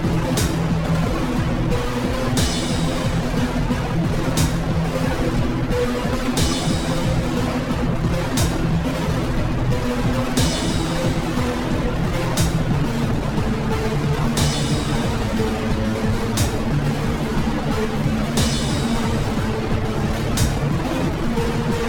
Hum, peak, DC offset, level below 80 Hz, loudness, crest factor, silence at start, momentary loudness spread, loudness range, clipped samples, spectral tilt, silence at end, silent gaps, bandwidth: none; -4 dBFS; under 0.1%; -28 dBFS; -21 LUFS; 14 dB; 0 s; 2 LU; 1 LU; under 0.1%; -5.5 dB/octave; 0 s; none; 19 kHz